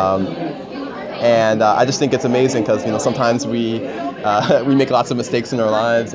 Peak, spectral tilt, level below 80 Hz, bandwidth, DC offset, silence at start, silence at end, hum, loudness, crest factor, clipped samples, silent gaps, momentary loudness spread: -2 dBFS; -5.5 dB/octave; -52 dBFS; 8 kHz; under 0.1%; 0 s; 0 s; none; -17 LUFS; 16 dB; under 0.1%; none; 11 LU